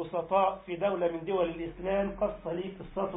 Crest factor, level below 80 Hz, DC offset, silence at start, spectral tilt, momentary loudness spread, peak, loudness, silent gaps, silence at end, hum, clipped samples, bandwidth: 18 dB; -54 dBFS; under 0.1%; 0 s; -3 dB/octave; 9 LU; -14 dBFS; -31 LUFS; none; 0 s; none; under 0.1%; 3.9 kHz